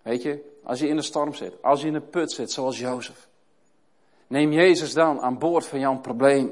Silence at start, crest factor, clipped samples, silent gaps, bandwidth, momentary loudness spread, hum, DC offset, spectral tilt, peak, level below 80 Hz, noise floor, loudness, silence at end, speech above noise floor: 0.05 s; 18 dB; under 0.1%; none; 11.5 kHz; 12 LU; none; under 0.1%; -5 dB/octave; -6 dBFS; -76 dBFS; -67 dBFS; -23 LUFS; 0 s; 44 dB